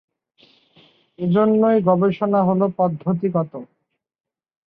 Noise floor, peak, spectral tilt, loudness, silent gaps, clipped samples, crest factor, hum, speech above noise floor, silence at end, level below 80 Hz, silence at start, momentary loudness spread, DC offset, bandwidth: -57 dBFS; -4 dBFS; -11.5 dB/octave; -19 LUFS; none; under 0.1%; 16 dB; none; 39 dB; 1.05 s; -64 dBFS; 1.2 s; 10 LU; under 0.1%; 4.7 kHz